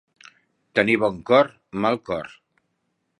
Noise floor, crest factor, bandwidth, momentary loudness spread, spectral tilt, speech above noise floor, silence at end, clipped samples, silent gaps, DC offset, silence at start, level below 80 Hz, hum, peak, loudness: -74 dBFS; 22 dB; 11 kHz; 12 LU; -6.5 dB/octave; 53 dB; 0.9 s; under 0.1%; none; under 0.1%; 0.75 s; -60 dBFS; none; -2 dBFS; -22 LUFS